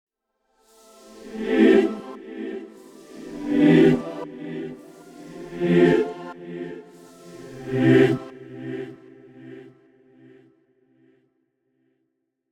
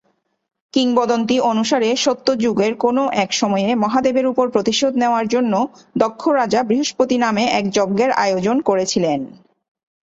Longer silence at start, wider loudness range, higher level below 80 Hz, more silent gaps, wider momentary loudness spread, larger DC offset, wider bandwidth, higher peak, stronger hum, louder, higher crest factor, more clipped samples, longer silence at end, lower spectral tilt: first, 1.25 s vs 0.75 s; first, 5 LU vs 1 LU; about the same, -58 dBFS vs -58 dBFS; neither; first, 26 LU vs 3 LU; neither; first, 11.5 kHz vs 8 kHz; second, -6 dBFS vs -2 dBFS; neither; second, -20 LUFS vs -17 LUFS; about the same, 18 dB vs 16 dB; neither; first, 2.9 s vs 0.75 s; first, -7.5 dB/octave vs -4 dB/octave